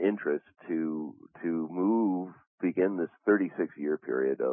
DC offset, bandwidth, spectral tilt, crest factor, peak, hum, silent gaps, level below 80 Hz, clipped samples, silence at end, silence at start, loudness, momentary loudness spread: under 0.1%; 3.5 kHz; -11.5 dB/octave; 18 dB; -12 dBFS; none; 2.47-2.58 s; -84 dBFS; under 0.1%; 0 s; 0 s; -30 LUFS; 9 LU